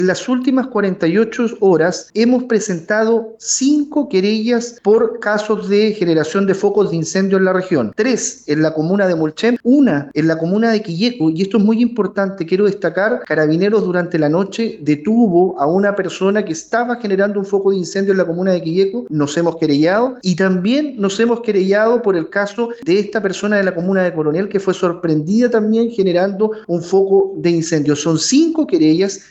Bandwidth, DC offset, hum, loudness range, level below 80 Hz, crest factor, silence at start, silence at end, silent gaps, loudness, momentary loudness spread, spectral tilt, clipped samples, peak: 8.4 kHz; under 0.1%; none; 1 LU; -60 dBFS; 12 dB; 0 s; 0.1 s; none; -15 LUFS; 5 LU; -5.5 dB/octave; under 0.1%; -2 dBFS